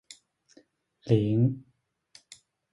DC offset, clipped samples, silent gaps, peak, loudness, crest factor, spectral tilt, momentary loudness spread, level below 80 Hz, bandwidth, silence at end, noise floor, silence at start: under 0.1%; under 0.1%; none; -10 dBFS; -26 LUFS; 22 dB; -8.5 dB/octave; 27 LU; -62 dBFS; 11.5 kHz; 1.15 s; -62 dBFS; 1.05 s